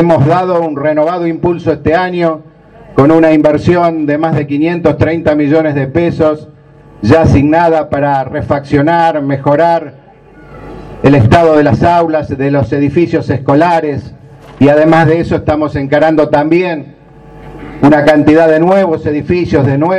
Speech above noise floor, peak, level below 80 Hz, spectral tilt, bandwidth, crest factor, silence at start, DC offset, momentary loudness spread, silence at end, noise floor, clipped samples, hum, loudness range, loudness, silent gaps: 28 dB; 0 dBFS; -34 dBFS; -8.5 dB/octave; 9.2 kHz; 10 dB; 0 s; under 0.1%; 8 LU; 0 s; -37 dBFS; 0.8%; none; 2 LU; -10 LUFS; none